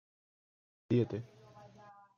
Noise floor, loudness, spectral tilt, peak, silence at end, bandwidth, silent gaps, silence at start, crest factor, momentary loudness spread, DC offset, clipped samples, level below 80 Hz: -59 dBFS; -35 LUFS; -9.5 dB/octave; -20 dBFS; 0.25 s; 6.8 kHz; none; 0.9 s; 20 dB; 24 LU; under 0.1%; under 0.1%; -74 dBFS